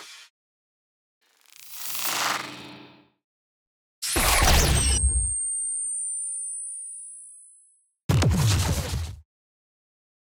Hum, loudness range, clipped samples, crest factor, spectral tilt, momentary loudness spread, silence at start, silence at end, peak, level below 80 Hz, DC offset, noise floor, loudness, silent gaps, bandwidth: none; 9 LU; under 0.1%; 20 dB; -3 dB/octave; 20 LU; 0 s; 1.1 s; -6 dBFS; -34 dBFS; under 0.1%; -60 dBFS; -24 LUFS; 0.30-1.21 s, 3.24-4.02 s, 8.04-8.09 s; over 20 kHz